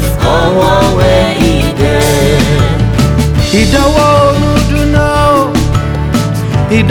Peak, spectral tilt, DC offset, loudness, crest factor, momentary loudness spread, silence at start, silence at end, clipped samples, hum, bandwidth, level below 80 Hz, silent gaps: 0 dBFS; -6 dB/octave; under 0.1%; -9 LUFS; 8 dB; 5 LU; 0 s; 0 s; under 0.1%; none; 19.5 kHz; -18 dBFS; none